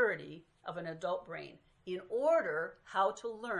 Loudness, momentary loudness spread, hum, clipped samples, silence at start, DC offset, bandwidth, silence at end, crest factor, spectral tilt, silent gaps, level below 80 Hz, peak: -36 LUFS; 17 LU; none; under 0.1%; 0 s; under 0.1%; 11 kHz; 0 s; 16 dB; -5 dB/octave; none; -76 dBFS; -20 dBFS